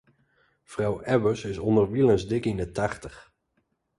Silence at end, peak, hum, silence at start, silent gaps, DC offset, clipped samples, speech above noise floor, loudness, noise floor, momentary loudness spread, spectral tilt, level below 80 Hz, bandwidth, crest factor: 0.75 s; -8 dBFS; none; 0.7 s; none; under 0.1%; under 0.1%; 49 dB; -25 LUFS; -74 dBFS; 12 LU; -7 dB/octave; -50 dBFS; 11.5 kHz; 18 dB